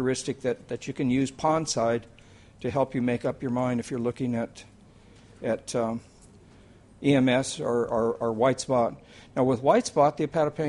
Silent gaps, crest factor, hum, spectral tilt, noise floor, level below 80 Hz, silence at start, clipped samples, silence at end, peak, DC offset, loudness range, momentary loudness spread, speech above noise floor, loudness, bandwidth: none; 18 dB; none; -5.5 dB/octave; -53 dBFS; -58 dBFS; 0 s; under 0.1%; 0 s; -8 dBFS; under 0.1%; 6 LU; 9 LU; 27 dB; -27 LUFS; 11.5 kHz